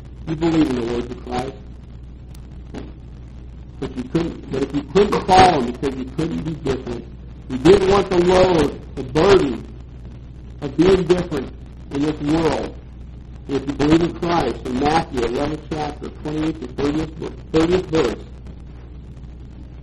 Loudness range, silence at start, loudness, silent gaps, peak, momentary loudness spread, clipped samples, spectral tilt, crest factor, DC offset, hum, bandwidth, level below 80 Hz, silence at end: 8 LU; 0 s; -19 LUFS; none; 0 dBFS; 24 LU; under 0.1%; -6.5 dB/octave; 20 dB; under 0.1%; none; 11.5 kHz; -36 dBFS; 0 s